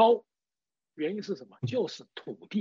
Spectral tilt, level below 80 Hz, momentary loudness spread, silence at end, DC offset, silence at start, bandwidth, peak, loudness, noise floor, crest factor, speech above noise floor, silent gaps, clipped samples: -5 dB/octave; -78 dBFS; 13 LU; 0 s; under 0.1%; 0 s; 7.6 kHz; -10 dBFS; -32 LUFS; under -90 dBFS; 20 dB; over 56 dB; none; under 0.1%